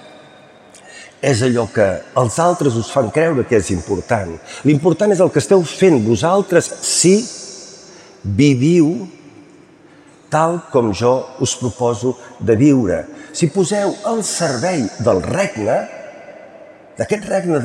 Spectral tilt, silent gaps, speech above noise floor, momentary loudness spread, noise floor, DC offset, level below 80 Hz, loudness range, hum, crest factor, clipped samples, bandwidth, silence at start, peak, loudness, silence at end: -5.5 dB/octave; none; 30 dB; 14 LU; -45 dBFS; under 0.1%; -52 dBFS; 5 LU; none; 16 dB; under 0.1%; 13.5 kHz; 0.9 s; -2 dBFS; -16 LUFS; 0 s